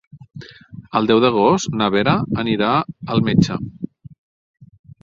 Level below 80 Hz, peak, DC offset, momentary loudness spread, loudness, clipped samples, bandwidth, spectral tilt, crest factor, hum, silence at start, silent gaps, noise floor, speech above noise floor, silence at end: -46 dBFS; 0 dBFS; under 0.1%; 21 LU; -18 LUFS; under 0.1%; 7.8 kHz; -6 dB/octave; 18 dB; none; 0.15 s; 4.18-4.54 s; -39 dBFS; 22 dB; 0.35 s